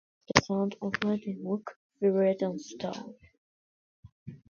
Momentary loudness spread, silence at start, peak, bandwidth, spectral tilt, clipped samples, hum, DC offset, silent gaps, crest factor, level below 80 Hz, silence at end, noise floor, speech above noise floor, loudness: 20 LU; 0.3 s; 0 dBFS; 7.4 kHz; -5 dB/octave; under 0.1%; none; under 0.1%; 1.76-1.90 s, 3.38-4.03 s, 4.12-4.26 s; 32 dB; -60 dBFS; 0.15 s; under -90 dBFS; over 60 dB; -30 LUFS